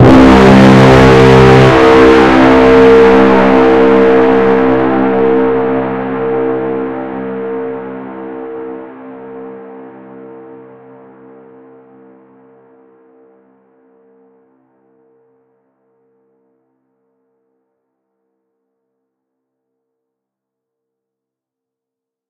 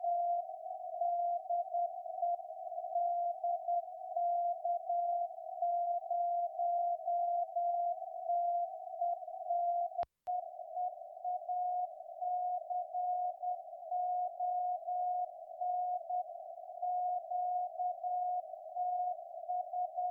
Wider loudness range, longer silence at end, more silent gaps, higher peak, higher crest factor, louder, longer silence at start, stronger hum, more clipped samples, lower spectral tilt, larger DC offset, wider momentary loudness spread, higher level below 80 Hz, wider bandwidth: first, 23 LU vs 3 LU; first, 12.45 s vs 0 s; neither; first, 0 dBFS vs -26 dBFS; about the same, 10 dB vs 10 dB; first, -7 LUFS vs -37 LUFS; about the same, 0 s vs 0 s; neither; first, 2% vs under 0.1%; first, -7 dB/octave vs -5.5 dB/octave; neither; first, 22 LU vs 7 LU; first, -30 dBFS vs -84 dBFS; first, 10.5 kHz vs 1.5 kHz